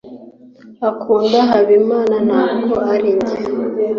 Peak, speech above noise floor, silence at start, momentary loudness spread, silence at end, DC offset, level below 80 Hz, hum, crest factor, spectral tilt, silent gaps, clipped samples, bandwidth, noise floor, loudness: -2 dBFS; 27 dB; 0.05 s; 8 LU; 0 s; under 0.1%; -54 dBFS; none; 12 dB; -6.5 dB/octave; none; under 0.1%; 7 kHz; -41 dBFS; -15 LUFS